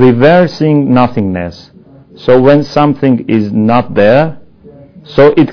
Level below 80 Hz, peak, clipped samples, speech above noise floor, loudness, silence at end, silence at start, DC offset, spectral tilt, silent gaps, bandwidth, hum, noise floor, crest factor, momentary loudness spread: -38 dBFS; 0 dBFS; 3%; 29 dB; -9 LUFS; 0 s; 0 s; under 0.1%; -8.5 dB/octave; none; 5.4 kHz; none; -37 dBFS; 10 dB; 10 LU